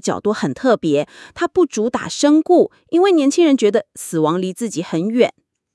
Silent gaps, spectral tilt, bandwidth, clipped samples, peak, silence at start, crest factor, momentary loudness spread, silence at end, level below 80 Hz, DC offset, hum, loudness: none; -5 dB/octave; 12 kHz; under 0.1%; 0 dBFS; 0.05 s; 16 dB; 8 LU; 0.45 s; -60 dBFS; under 0.1%; none; -17 LUFS